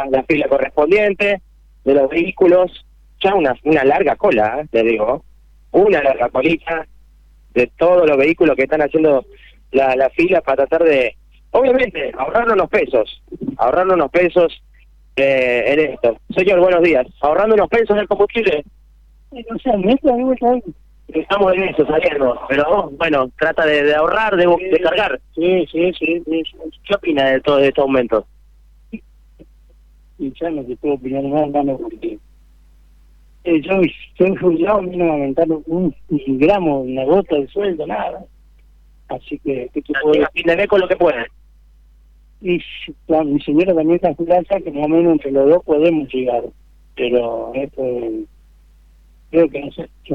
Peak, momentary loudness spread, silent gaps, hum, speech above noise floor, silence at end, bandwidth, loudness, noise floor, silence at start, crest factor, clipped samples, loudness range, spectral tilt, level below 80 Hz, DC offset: -2 dBFS; 11 LU; none; none; 32 dB; 0 s; 7.2 kHz; -16 LUFS; -47 dBFS; 0 s; 16 dB; under 0.1%; 6 LU; -7.5 dB/octave; -44 dBFS; under 0.1%